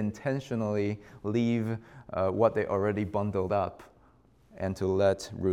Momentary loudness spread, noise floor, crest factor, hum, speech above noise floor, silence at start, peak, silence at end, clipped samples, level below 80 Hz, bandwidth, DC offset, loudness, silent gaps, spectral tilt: 10 LU; -61 dBFS; 20 dB; none; 32 dB; 0 s; -10 dBFS; 0 s; under 0.1%; -62 dBFS; 13.5 kHz; under 0.1%; -30 LUFS; none; -7.5 dB/octave